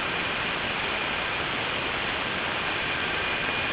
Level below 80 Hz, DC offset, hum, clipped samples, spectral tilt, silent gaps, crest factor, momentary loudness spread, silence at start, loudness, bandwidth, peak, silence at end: -48 dBFS; under 0.1%; none; under 0.1%; -0.5 dB/octave; none; 14 dB; 1 LU; 0 s; -26 LUFS; 4 kHz; -14 dBFS; 0 s